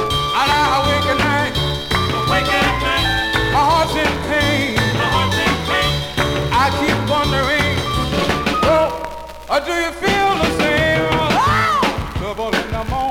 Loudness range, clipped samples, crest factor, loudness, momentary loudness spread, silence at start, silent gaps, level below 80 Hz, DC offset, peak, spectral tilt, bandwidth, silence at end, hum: 1 LU; under 0.1%; 14 dB; -16 LUFS; 6 LU; 0 s; none; -30 dBFS; under 0.1%; -4 dBFS; -4.5 dB/octave; 18.5 kHz; 0 s; none